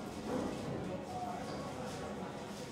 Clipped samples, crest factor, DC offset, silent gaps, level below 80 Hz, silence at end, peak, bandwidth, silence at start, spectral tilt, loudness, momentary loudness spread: under 0.1%; 16 dB; under 0.1%; none; -62 dBFS; 0 s; -26 dBFS; 16 kHz; 0 s; -5.5 dB/octave; -42 LUFS; 5 LU